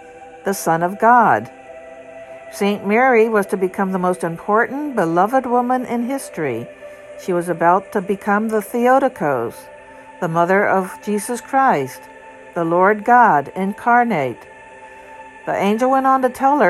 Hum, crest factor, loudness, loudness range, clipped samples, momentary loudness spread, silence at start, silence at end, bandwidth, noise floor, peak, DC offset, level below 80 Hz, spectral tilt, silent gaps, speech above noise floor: none; 18 dB; -17 LUFS; 3 LU; under 0.1%; 22 LU; 0 s; 0 s; 14 kHz; -39 dBFS; 0 dBFS; under 0.1%; -60 dBFS; -6 dB/octave; none; 23 dB